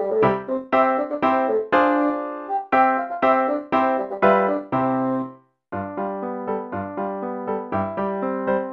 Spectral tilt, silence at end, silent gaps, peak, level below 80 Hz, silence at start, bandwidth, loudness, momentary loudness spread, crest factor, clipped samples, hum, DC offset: -8.5 dB/octave; 0 s; none; -4 dBFS; -60 dBFS; 0 s; 6.6 kHz; -22 LUFS; 10 LU; 18 dB; under 0.1%; none; under 0.1%